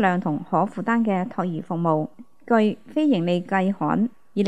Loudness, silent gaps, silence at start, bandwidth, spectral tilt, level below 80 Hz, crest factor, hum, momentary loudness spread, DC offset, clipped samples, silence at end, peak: -23 LUFS; none; 0 s; 8.8 kHz; -8 dB/octave; -70 dBFS; 18 dB; none; 6 LU; 0.4%; under 0.1%; 0 s; -6 dBFS